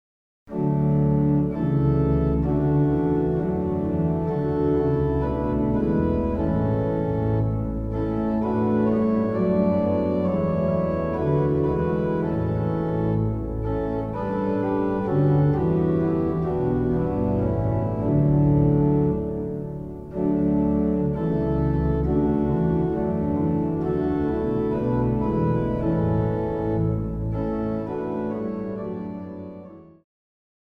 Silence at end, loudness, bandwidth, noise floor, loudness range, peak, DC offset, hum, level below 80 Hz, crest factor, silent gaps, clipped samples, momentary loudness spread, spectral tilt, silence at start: 0.8 s; -23 LUFS; 4.7 kHz; -43 dBFS; 3 LU; -10 dBFS; 0.1%; none; -36 dBFS; 14 dB; none; under 0.1%; 7 LU; -11.5 dB/octave; 0.45 s